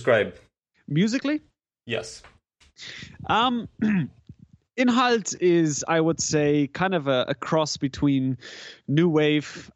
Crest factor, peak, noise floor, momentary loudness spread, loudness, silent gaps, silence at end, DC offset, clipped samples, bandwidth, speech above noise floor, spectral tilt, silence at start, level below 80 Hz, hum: 18 dB; -6 dBFS; -50 dBFS; 16 LU; -24 LUFS; none; 0.1 s; under 0.1%; under 0.1%; 9.6 kHz; 27 dB; -5 dB/octave; 0 s; -56 dBFS; none